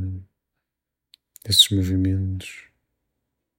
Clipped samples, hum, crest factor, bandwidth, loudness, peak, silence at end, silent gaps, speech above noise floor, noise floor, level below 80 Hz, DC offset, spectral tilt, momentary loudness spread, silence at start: under 0.1%; none; 24 dB; 16.5 kHz; -19 LUFS; -2 dBFS; 0.95 s; none; 64 dB; -84 dBFS; -52 dBFS; under 0.1%; -3.5 dB/octave; 24 LU; 0 s